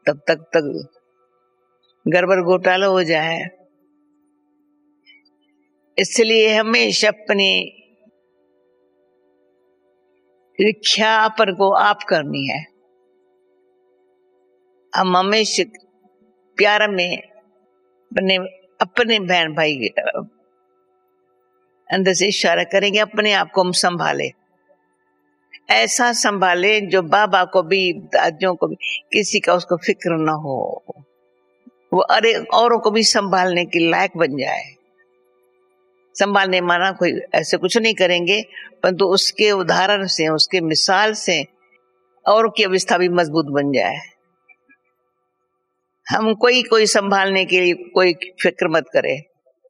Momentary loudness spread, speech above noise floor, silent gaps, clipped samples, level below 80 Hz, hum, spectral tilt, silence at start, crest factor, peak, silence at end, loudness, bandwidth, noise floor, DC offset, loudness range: 10 LU; 55 dB; none; under 0.1%; -72 dBFS; none; -3 dB/octave; 0.05 s; 20 dB; 0 dBFS; 0.45 s; -17 LUFS; 13.5 kHz; -72 dBFS; under 0.1%; 6 LU